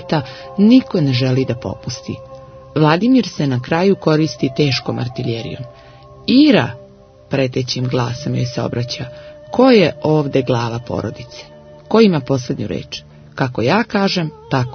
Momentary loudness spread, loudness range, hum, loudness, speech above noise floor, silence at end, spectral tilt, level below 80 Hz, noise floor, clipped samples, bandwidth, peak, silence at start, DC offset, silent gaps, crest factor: 18 LU; 3 LU; none; -16 LUFS; 27 dB; 0 s; -6.5 dB/octave; -48 dBFS; -43 dBFS; under 0.1%; 6.6 kHz; 0 dBFS; 0 s; under 0.1%; none; 16 dB